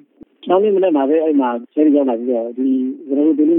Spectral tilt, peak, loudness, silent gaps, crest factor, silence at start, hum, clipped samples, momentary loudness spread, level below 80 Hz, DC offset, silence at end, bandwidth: -11.5 dB/octave; -2 dBFS; -16 LUFS; none; 14 dB; 0.45 s; none; under 0.1%; 6 LU; -74 dBFS; under 0.1%; 0 s; 3.7 kHz